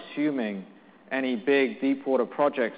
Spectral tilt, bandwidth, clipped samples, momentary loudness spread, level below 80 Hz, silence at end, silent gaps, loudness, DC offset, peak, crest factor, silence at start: -3.5 dB/octave; 4.9 kHz; under 0.1%; 9 LU; -78 dBFS; 0 s; none; -26 LUFS; under 0.1%; -10 dBFS; 16 dB; 0 s